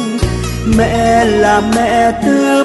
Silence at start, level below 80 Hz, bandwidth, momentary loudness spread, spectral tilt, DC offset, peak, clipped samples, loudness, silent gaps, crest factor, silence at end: 0 s; -24 dBFS; 12 kHz; 6 LU; -5.5 dB/octave; under 0.1%; 0 dBFS; under 0.1%; -12 LUFS; none; 10 dB; 0 s